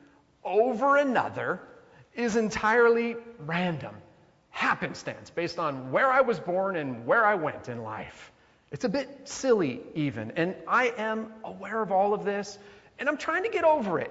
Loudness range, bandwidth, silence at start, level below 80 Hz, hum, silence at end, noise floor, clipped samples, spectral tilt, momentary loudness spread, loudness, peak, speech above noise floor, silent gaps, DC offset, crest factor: 3 LU; 8 kHz; 0.45 s; -64 dBFS; none; 0 s; -50 dBFS; under 0.1%; -5.5 dB/octave; 15 LU; -27 LUFS; -10 dBFS; 23 dB; none; under 0.1%; 18 dB